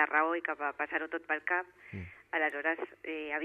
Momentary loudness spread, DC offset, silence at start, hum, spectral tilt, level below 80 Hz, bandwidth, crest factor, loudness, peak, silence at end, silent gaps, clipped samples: 15 LU; under 0.1%; 0 s; none; -6.5 dB/octave; -70 dBFS; 10.5 kHz; 22 dB; -33 LUFS; -12 dBFS; 0 s; none; under 0.1%